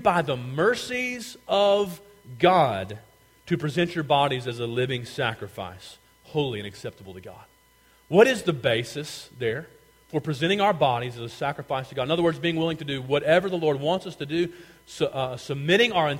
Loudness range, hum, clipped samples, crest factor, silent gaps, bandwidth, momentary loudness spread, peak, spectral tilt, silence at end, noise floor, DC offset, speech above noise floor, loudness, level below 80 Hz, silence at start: 4 LU; none; under 0.1%; 20 dB; none; 16.5 kHz; 17 LU; -4 dBFS; -5.5 dB/octave; 0 s; -59 dBFS; under 0.1%; 34 dB; -25 LUFS; -60 dBFS; 0 s